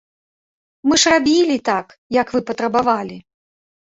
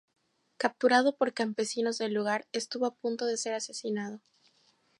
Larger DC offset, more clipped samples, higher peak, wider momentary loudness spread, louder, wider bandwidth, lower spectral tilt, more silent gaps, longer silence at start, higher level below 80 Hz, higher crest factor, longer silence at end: neither; neither; first, -2 dBFS vs -10 dBFS; about the same, 10 LU vs 10 LU; first, -17 LUFS vs -30 LUFS; second, 8.2 kHz vs 11.5 kHz; about the same, -2.5 dB/octave vs -3 dB/octave; first, 1.98-2.10 s vs none; first, 0.85 s vs 0.6 s; first, -54 dBFS vs -86 dBFS; about the same, 18 dB vs 20 dB; second, 0.65 s vs 0.8 s